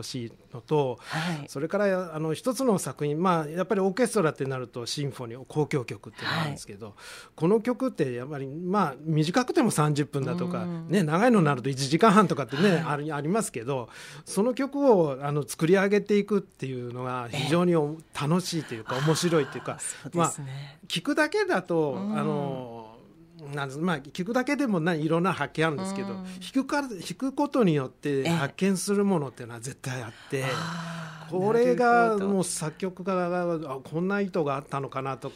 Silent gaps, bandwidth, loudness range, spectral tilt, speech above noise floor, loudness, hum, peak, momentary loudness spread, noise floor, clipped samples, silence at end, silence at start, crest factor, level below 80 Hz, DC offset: none; 16 kHz; 5 LU; -5.5 dB/octave; 25 dB; -27 LUFS; none; -6 dBFS; 13 LU; -51 dBFS; under 0.1%; 0 s; 0 s; 20 dB; -66 dBFS; under 0.1%